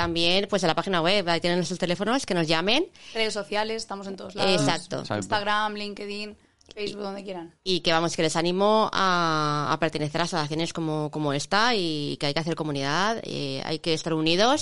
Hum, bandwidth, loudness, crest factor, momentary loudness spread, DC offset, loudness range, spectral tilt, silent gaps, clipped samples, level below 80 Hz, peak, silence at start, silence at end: none; 11.5 kHz; -25 LUFS; 18 dB; 12 LU; 0.8%; 4 LU; -4 dB/octave; none; under 0.1%; -54 dBFS; -6 dBFS; 0 s; 0 s